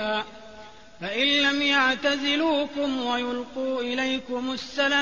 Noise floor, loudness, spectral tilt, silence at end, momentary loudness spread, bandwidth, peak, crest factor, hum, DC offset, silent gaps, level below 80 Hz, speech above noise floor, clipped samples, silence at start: -47 dBFS; -24 LUFS; -2.5 dB/octave; 0 s; 10 LU; 8 kHz; -10 dBFS; 16 dB; none; 0.3%; none; -60 dBFS; 22 dB; under 0.1%; 0 s